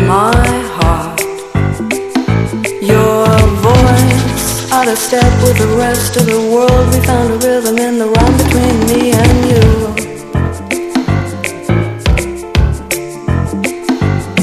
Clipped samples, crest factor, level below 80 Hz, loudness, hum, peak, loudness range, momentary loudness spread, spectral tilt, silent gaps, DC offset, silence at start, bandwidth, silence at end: 0.2%; 10 dB; -20 dBFS; -11 LUFS; none; 0 dBFS; 5 LU; 8 LU; -5.5 dB/octave; none; 0.2%; 0 s; 14.5 kHz; 0 s